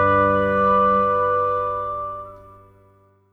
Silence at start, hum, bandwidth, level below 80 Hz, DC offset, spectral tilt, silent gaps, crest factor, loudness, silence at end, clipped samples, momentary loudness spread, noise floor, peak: 0 s; none; 5.2 kHz; -48 dBFS; under 0.1%; -8.5 dB/octave; none; 14 dB; -19 LUFS; 0.95 s; under 0.1%; 14 LU; -56 dBFS; -6 dBFS